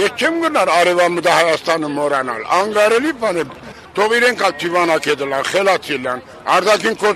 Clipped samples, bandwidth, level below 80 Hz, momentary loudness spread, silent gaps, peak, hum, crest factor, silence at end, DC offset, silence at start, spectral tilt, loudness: under 0.1%; 13.5 kHz; -56 dBFS; 8 LU; none; 0 dBFS; none; 16 dB; 0 s; under 0.1%; 0 s; -3 dB/octave; -15 LUFS